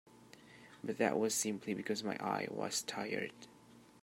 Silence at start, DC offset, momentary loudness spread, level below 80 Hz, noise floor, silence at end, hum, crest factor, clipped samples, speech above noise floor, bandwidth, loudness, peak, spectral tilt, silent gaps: 0.05 s; under 0.1%; 23 LU; -82 dBFS; -59 dBFS; 0.05 s; none; 22 dB; under 0.1%; 21 dB; 16 kHz; -38 LUFS; -18 dBFS; -3 dB/octave; none